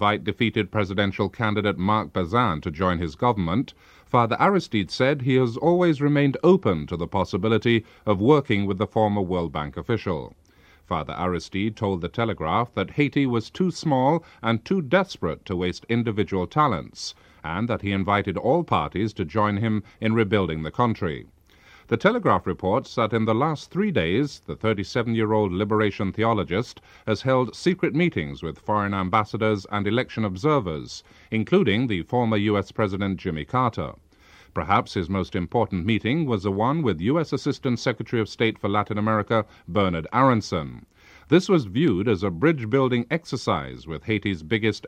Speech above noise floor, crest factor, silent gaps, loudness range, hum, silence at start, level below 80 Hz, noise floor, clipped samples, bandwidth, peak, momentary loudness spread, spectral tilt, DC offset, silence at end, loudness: 30 dB; 20 dB; none; 4 LU; none; 0 s; -50 dBFS; -53 dBFS; under 0.1%; 9.8 kHz; -4 dBFS; 8 LU; -7 dB/octave; under 0.1%; 0 s; -24 LUFS